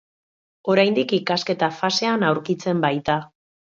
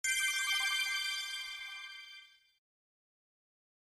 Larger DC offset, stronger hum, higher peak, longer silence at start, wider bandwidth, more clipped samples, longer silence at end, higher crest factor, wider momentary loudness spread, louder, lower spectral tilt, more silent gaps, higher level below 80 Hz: neither; neither; first, -4 dBFS vs -22 dBFS; first, 0.65 s vs 0.05 s; second, 7.6 kHz vs 15.5 kHz; neither; second, 0.45 s vs 1.65 s; about the same, 18 dB vs 18 dB; second, 6 LU vs 18 LU; first, -21 LUFS vs -33 LUFS; first, -5 dB/octave vs 5.5 dB/octave; neither; first, -60 dBFS vs -78 dBFS